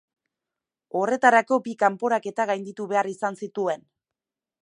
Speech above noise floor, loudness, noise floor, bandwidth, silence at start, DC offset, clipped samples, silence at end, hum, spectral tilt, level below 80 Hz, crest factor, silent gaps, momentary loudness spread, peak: 65 dB; -24 LUFS; -89 dBFS; 11 kHz; 0.95 s; under 0.1%; under 0.1%; 0.85 s; none; -5 dB/octave; -82 dBFS; 22 dB; none; 11 LU; -4 dBFS